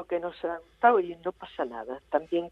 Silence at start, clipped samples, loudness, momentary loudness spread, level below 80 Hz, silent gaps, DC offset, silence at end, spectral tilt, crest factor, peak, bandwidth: 0 s; under 0.1%; -29 LUFS; 13 LU; -64 dBFS; none; under 0.1%; 0 s; -7 dB/octave; 22 dB; -8 dBFS; 5.2 kHz